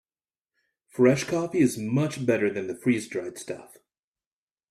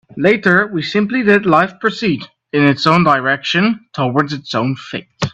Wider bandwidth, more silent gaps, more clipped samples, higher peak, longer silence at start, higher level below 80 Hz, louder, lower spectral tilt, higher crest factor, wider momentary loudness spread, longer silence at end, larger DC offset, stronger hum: first, 14.5 kHz vs 8.4 kHz; neither; neither; second, -8 dBFS vs 0 dBFS; first, 0.95 s vs 0.15 s; second, -66 dBFS vs -52 dBFS; second, -25 LUFS vs -15 LUFS; about the same, -6 dB/octave vs -6 dB/octave; first, 20 dB vs 14 dB; first, 16 LU vs 9 LU; first, 1.05 s vs 0.05 s; neither; neither